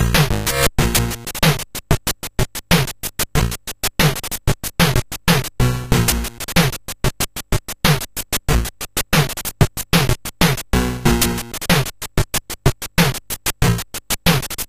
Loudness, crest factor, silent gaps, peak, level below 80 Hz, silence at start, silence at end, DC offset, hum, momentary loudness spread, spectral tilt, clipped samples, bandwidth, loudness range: -19 LUFS; 18 dB; none; 0 dBFS; -26 dBFS; 0 s; 0.05 s; under 0.1%; none; 7 LU; -4 dB/octave; under 0.1%; 16 kHz; 2 LU